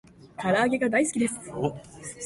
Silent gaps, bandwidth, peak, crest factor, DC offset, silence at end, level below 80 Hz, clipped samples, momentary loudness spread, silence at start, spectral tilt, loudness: none; 11.5 kHz; -12 dBFS; 16 dB; under 0.1%; 0 s; -60 dBFS; under 0.1%; 17 LU; 0.2 s; -4.5 dB/octave; -26 LUFS